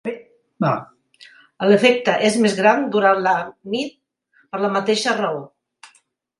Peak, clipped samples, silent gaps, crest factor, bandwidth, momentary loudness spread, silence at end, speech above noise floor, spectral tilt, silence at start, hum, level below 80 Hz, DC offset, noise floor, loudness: 0 dBFS; under 0.1%; none; 20 dB; 11.5 kHz; 14 LU; 0.95 s; 43 dB; -4.5 dB/octave; 0.05 s; none; -68 dBFS; under 0.1%; -61 dBFS; -18 LUFS